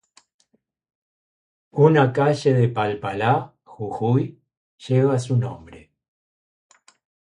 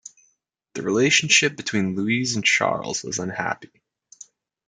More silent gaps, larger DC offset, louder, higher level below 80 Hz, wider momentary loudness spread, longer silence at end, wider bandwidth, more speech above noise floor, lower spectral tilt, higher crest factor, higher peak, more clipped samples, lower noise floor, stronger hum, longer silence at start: first, 4.57-4.78 s vs none; neither; about the same, -21 LUFS vs -21 LUFS; first, -58 dBFS vs -66 dBFS; first, 15 LU vs 12 LU; first, 1.5 s vs 0.45 s; about the same, 10.5 kHz vs 10.5 kHz; about the same, 48 dB vs 47 dB; first, -7.5 dB/octave vs -2.5 dB/octave; about the same, 22 dB vs 20 dB; about the same, -2 dBFS vs -4 dBFS; neither; about the same, -67 dBFS vs -69 dBFS; neither; first, 1.75 s vs 0.05 s